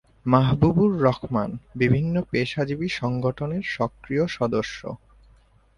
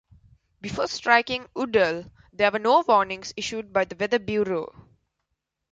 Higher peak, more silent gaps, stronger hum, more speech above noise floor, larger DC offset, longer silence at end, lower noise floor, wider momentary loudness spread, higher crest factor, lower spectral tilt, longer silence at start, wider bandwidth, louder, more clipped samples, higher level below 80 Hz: about the same, -2 dBFS vs -4 dBFS; neither; neither; second, 34 dB vs 56 dB; neither; second, 0.8 s vs 1.05 s; second, -56 dBFS vs -80 dBFS; second, 9 LU vs 14 LU; about the same, 20 dB vs 20 dB; first, -7.5 dB/octave vs -4 dB/octave; second, 0.25 s vs 0.65 s; first, 10.5 kHz vs 9.2 kHz; about the same, -24 LUFS vs -24 LUFS; neither; first, -48 dBFS vs -58 dBFS